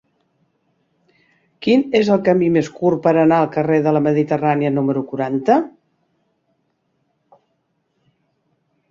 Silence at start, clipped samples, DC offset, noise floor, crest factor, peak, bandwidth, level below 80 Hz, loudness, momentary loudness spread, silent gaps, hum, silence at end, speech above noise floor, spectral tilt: 1.6 s; under 0.1%; under 0.1%; -68 dBFS; 16 dB; -2 dBFS; 7.4 kHz; -62 dBFS; -17 LUFS; 6 LU; none; none; 3.2 s; 53 dB; -7.5 dB/octave